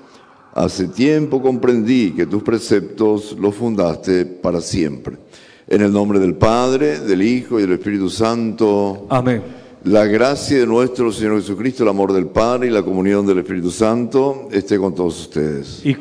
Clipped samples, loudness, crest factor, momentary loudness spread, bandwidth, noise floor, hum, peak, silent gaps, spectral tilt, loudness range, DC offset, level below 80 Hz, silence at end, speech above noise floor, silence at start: under 0.1%; -17 LUFS; 14 dB; 7 LU; 10.5 kHz; -45 dBFS; none; -2 dBFS; none; -6.5 dB/octave; 2 LU; under 0.1%; -46 dBFS; 0 s; 29 dB; 0.55 s